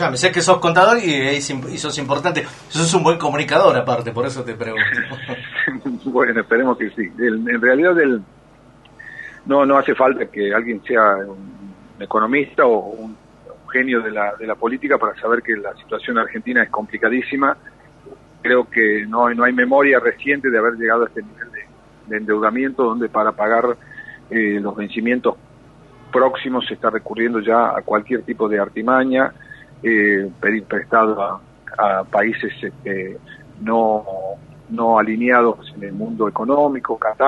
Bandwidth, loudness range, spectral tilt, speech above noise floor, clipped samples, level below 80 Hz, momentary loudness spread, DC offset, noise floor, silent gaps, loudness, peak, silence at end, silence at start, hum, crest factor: 11.5 kHz; 4 LU; -4.5 dB/octave; 29 dB; under 0.1%; -56 dBFS; 14 LU; under 0.1%; -47 dBFS; none; -18 LUFS; 0 dBFS; 0 s; 0 s; none; 18 dB